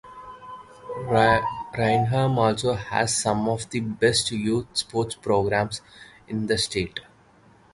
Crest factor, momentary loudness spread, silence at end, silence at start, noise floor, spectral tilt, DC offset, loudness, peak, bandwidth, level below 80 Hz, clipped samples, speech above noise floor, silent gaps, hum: 22 dB; 17 LU; 0.75 s; 0.05 s; -55 dBFS; -4.5 dB/octave; under 0.1%; -24 LUFS; -4 dBFS; 11.5 kHz; -50 dBFS; under 0.1%; 32 dB; none; none